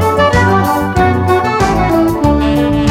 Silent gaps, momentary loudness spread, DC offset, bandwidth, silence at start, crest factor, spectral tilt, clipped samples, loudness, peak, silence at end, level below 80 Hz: none; 2 LU; under 0.1%; 16.5 kHz; 0 s; 10 dB; -6.5 dB/octave; under 0.1%; -11 LUFS; 0 dBFS; 0 s; -24 dBFS